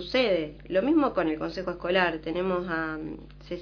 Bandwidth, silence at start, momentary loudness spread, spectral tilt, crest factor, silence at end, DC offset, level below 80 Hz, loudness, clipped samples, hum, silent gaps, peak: 5.4 kHz; 0 s; 12 LU; -6.5 dB/octave; 18 dB; 0 s; under 0.1%; -50 dBFS; -27 LUFS; under 0.1%; 50 Hz at -50 dBFS; none; -10 dBFS